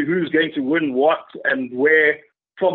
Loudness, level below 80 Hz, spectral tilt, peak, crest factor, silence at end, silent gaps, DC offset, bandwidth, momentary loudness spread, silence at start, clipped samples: -18 LUFS; -68 dBFS; -3 dB/octave; -4 dBFS; 16 dB; 0 s; none; under 0.1%; 4.2 kHz; 8 LU; 0 s; under 0.1%